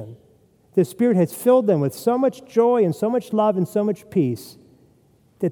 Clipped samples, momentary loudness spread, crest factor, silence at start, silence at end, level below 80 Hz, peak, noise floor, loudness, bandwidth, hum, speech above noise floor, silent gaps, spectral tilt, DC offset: under 0.1%; 7 LU; 16 dB; 0 s; 0 s; -68 dBFS; -6 dBFS; -57 dBFS; -20 LUFS; 19 kHz; none; 38 dB; none; -7.5 dB/octave; under 0.1%